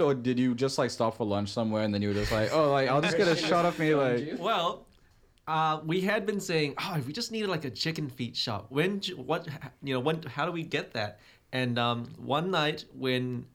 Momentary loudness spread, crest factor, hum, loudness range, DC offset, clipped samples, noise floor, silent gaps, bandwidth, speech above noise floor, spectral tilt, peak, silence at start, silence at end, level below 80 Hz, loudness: 9 LU; 18 dB; none; 5 LU; under 0.1%; under 0.1%; -62 dBFS; none; 17 kHz; 33 dB; -5.5 dB/octave; -12 dBFS; 0 s; 0.1 s; -56 dBFS; -29 LUFS